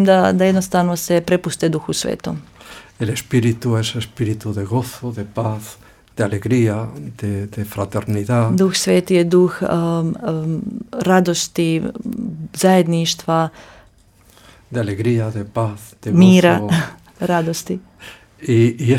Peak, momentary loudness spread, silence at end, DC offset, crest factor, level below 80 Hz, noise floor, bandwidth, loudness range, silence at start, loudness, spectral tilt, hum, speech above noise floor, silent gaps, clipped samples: 0 dBFS; 14 LU; 0 s; under 0.1%; 16 dB; -50 dBFS; -50 dBFS; 16.5 kHz; 5 LU; 0 s; -18 LUFS; -6 dB/octave; none; 33 dB; none; under 0.1%